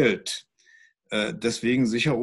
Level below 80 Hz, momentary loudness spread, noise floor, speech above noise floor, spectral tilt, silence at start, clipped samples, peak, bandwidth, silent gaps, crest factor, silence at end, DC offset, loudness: -60 dBFS; 9 LU; -58 dBFS; 34 dB; -4.5 dB/octave; 0 s; under 0.1%; -8 dBFS; 12.5 kHz; none; 18 dB; 0 s; under 0.1%; -26 LUFS